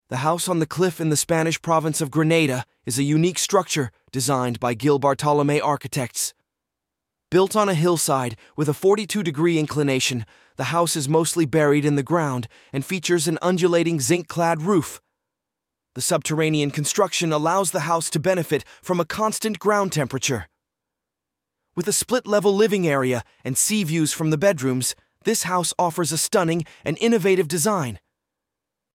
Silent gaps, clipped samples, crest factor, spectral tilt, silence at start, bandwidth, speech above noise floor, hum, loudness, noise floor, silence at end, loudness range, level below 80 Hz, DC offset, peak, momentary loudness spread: none; under 0.1%; 18 dB; -4.5 dB/octave; 0.1 s; 17 kHz; 63 dB; none; -21 LUFS; -84 dBFS; 0.95 s; 2 LU; -60 dBFS; under 0.1%; -4 dBFS; 7 LU